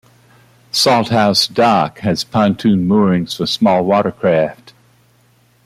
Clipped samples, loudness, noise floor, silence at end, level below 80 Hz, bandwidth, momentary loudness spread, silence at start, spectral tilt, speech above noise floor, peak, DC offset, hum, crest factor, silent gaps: under 0.1%; -14 LUFS; -53 dBFS; 1.1 s; -54 dBFS; 15.5 kHz; 6 LU; 0.75 s; -5 dB/octave; 40 dB; 0 dBFS; under 0.1%; 60 Hz at -45 dBFS; 14 dB; none